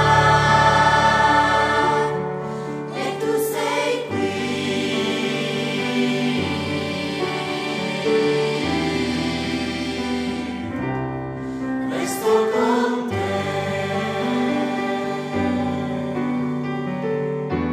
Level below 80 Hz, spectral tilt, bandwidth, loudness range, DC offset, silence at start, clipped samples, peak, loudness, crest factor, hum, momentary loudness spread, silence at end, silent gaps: -46 dBFS; -5 dB/octave; 15.5 kHz; 5 LU; under 0.1%; 0 s; under 0.1%; -2 dBFS; -21 LUFS; 18 dB; none; 10 LU; 0 s; none